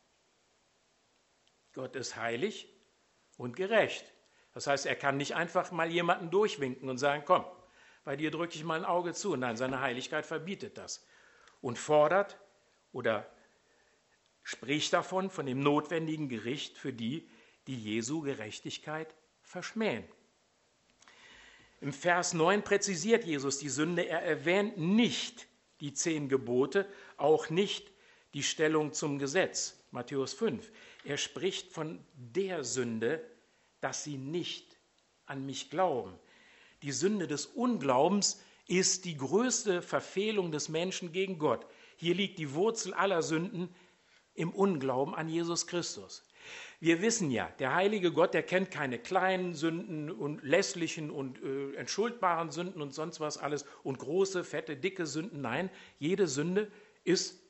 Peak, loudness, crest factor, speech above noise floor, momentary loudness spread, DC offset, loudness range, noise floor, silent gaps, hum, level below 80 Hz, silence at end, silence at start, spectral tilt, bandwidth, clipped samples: -10 dBFS; -33 LUFS; 24 dB; 39 dB; 13 LU; under 0.1%; 7 LU; -72 dBFS; none; none; -76 dBFS; 0.15 s; 1.75 s; -4 dB/octave; 8.2 kHz; under 0.1%